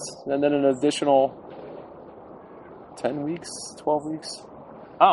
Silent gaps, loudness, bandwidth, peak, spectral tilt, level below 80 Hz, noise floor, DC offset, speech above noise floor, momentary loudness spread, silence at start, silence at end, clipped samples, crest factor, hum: none; -24 LUFS; 11.5 kHz; -2 dBFS; -4.5 dB/octave; -64 dBFS; -44 dBFS; under 0.1%; 20 dB; 24 LU; 0 s; 0 s; under 0.1%; 22 dB; none